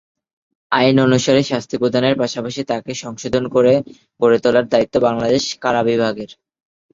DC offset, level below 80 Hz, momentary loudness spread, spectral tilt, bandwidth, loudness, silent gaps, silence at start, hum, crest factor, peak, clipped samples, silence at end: under 0.1%; -52 dBFS; 10 LU; -5 dB/octave; 7.8 kHz; -17 LUFS; none; 0.7 s; none; 16 dB; 0 dBFS; under 0.1%; 0.6 s